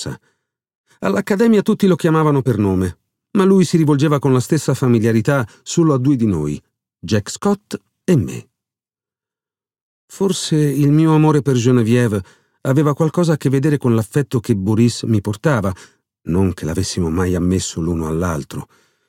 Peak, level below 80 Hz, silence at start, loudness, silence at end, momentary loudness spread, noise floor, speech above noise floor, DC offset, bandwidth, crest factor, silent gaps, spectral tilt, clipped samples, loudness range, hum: -2 dBFS; -44 dBFS; 0 s; -17 LUFS; 0.45 s; 11 LU; under -90 dBFS; over 74 dB; under 0.1%; 16 kHz; 14 dB; 0.75-0.84 s, 9.82-10.08 s; -6.5 dB/octave; under 0.1%; 6 LU; none